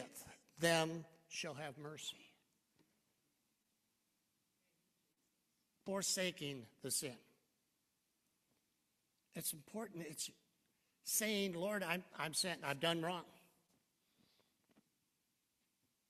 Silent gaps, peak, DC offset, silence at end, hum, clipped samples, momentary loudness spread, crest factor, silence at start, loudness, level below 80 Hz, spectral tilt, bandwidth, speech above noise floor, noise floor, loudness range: none; -22 dBFS; under 0.1%; 2.7 s; none; under 0.1%; 15 LU; 26 dB; 0 s; -42 LUFS; -86 dBFS; -2.5 dB/octave; 14.5 kHz; 43 dB; -85 dBFS; 12 LU